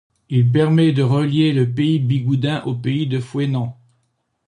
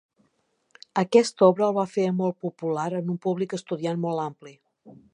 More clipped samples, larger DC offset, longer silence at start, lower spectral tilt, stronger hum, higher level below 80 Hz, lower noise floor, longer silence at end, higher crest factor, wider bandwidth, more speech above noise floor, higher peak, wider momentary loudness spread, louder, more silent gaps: neither; neither; second, 0.3 s vs 0.95 s; first, -8 dB/octave vs -6.5 dB/octave; neither; first, -56 dBFS vs -76 dBFS; about the same, -68 dBFS vs -71 dBFS; first, 0.75 s vs 0.2 s; second, 14 dB vs 22 dB; about the same, 10 kHz vs 11 kHz; first, 51 dB vs 46 dB; about the same, -4 dBFS vs -4 dBFS; second, 7 LU vs 11 LU; first, -18 LUFS vs -25 LUFS; neither